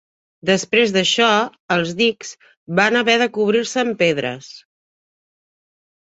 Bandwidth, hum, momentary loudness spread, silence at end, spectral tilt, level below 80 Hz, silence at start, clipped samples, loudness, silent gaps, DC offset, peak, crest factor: 8.2 kHz; none; 11 LU; 1.45 s; -3.5 dB/octave; -64 dBFS; 0.45 s; under 0.1%; -17 LUFS; 1.60-1.68 s, 2.57-2.66 s; under 0.1%; -2 dBFS; 18 dB